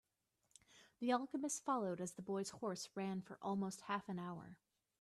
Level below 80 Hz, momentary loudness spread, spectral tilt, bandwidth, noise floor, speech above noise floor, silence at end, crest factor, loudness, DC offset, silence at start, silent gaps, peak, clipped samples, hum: -84 dBFS; 8 LU; -5 dB/octave; 13 kHz; -84 dBFS; 41 dB; 0.45 s; 20 dB; -44 LUFS; under 0.1%; 0.75 s; none; -24 dBFS; under 0.1%; none